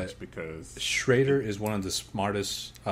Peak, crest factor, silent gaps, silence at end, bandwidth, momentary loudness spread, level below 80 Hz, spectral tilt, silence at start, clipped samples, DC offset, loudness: -10 dBFS; 20 dB; none; 0 s; 16 kHz; 15 LU; -54 dBFS; -4 dB/octave; 0 s; under 0.1%; under 0.1%; -28 LUFS